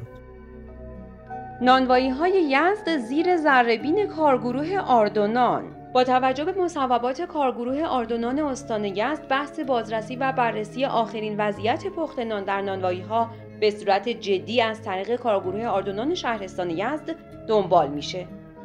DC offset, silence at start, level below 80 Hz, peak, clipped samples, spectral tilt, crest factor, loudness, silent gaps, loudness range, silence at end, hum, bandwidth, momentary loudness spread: under 0.1%; 0 s; -52 dBFS; -4 dBFS; under 0.1%; -5.5 dB/octave; 20 dB; -23 LUFS; none; 5 LU; 0 s; none; 10.5 kHz; 11 LU